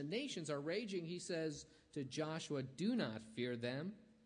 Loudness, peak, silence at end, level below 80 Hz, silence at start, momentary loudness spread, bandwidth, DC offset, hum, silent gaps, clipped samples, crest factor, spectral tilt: -44 LUFS; -28 dBFS; 0.15 s; -80 dBFS; 0 s; 7 LU; 10.5 kHz; under 0.1%; none; none; under 0.1%; 14 dB; -5 dB/octave